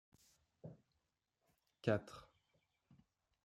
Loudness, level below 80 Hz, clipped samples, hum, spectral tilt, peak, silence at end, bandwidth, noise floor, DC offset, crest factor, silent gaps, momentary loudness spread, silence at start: -41 LUFS; -78 dBFS; under 0.1%; none; -7 dB/octave; -20 dBFS; 1.2 s; 14 kHz; -88 dBFS; under 0.1%; 28 dB; none; 20 LU; 0.65 s